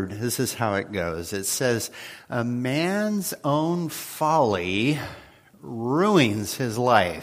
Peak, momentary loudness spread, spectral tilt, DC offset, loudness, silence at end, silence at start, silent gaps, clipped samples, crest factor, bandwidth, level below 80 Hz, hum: -2 dBFS; 10 LU; -4.5 dB/octave; under 0.1%; -24 LUFS; 0 s; 0 s; none; under 0.1%; 22 dB; 15.5 kHz; -58 dBFS; none